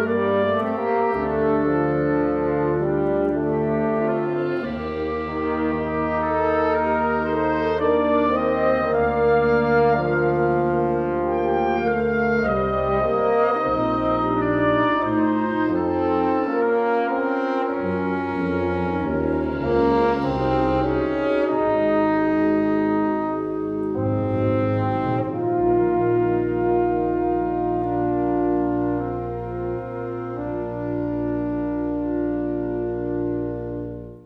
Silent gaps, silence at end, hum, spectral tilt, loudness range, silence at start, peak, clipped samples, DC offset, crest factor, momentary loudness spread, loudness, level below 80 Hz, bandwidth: none; 0.05 s; none; -9.5 dB/octave; 5 LU; 0 s; -6 dBFS; under 0.1%; under 0.1%; 14 dB; 6 LU; -22 LUFS; -42 dBFS; 6 kHz